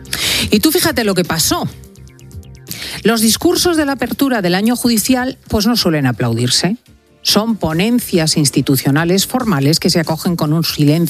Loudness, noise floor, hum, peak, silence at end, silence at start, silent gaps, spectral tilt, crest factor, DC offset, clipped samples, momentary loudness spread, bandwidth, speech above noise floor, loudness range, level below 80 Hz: -14 LUFS; -37 dBFS; none; 0 dBFS; 0 s; 0 s; none; -4 dB/octave; 14 dB; under 0.1%; under 0.1%; 5 LU; 15.5 kHz; 24 dB; 2 LU; -40 dBFS